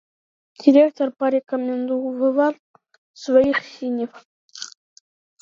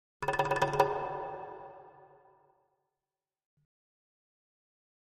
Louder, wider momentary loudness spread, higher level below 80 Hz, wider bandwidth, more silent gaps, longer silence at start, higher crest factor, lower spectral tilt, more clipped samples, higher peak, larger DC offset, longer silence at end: first, -20 LUFS vs -32 LUFS; about the same, 20 LU vs 21 LU; about the same, -64 dBFS vs -62 dBFS; second, 7.6 kHz vs 13 kHz; first, 2.59-2.74 s, 2.98-3.14 s, 4.25-4.49 s vs none; first, 0.6 s vs 0.2 s; second, 20 dB vs 28 dB; about the same, -4.5 dB/octave vs -5 dB/octave; neither; first, -2 dBFS vs -10 dBFS; neither; second, 0.75 s vs 3.05 s